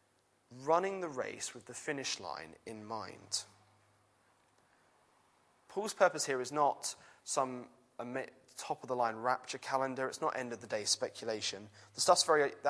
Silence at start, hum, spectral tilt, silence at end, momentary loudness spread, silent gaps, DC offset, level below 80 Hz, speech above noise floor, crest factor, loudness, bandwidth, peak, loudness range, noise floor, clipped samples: 0.5 s; none; -2 dB/octave; 0 s; 17 LU; none; under 0.1%; -84 dBFS; 38 dB; 24 dB; -35 LUFS; 11 kHz; -14 dBFS; 8 LU; -73 dBFS; under 0.1%